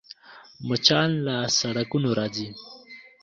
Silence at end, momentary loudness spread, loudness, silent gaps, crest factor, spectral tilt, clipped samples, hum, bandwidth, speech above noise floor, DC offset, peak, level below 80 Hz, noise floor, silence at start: 0.2 s; 23 LU; -23 LUFS; none; 24 dB; -4 dB/octave; under 0.1%; none; 7.6 kHz; 23 dB; under 0.1%; -2 dBFS; -62 dBFS; -48 dBFS; 0.1 s